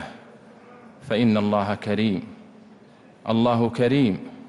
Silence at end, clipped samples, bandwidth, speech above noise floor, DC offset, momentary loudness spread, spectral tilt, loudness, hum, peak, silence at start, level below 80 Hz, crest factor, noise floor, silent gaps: 0 s; under 0.1%; 11 kHz; 29 dB; under 0.1%; 16 LU; -8 dB/octave; -22 LUFS; none; -10 dBFS; 0 s; -62 dBFS; 14 dB; -50 dBFS; none